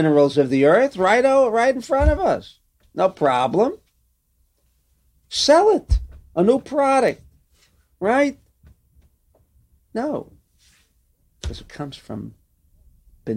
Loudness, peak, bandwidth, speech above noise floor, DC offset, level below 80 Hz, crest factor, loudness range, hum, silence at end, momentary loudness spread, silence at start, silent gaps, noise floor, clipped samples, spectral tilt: -19 LUFS; -4 dBFS; 12 kHz; 47 dB; under 0.1%; -34 dBFS; 18 dB; 15 LU; none; 0 s; 19 LU; 0 s; none; -65 dBFS; under 0.1%; -5.5 dB/octave